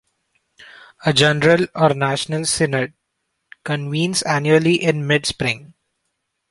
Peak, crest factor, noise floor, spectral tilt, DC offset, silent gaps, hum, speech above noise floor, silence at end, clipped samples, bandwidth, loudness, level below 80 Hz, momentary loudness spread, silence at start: 0 dBFS; 20 dB; -74 dBFS; -4.5 dB/octave; under 0.1%; none; none; 56 dB; 0.85 s; under 0.1%; 11.5 kHz; -18 LUFS; -52 dBFS; 10 LU; 0.6 s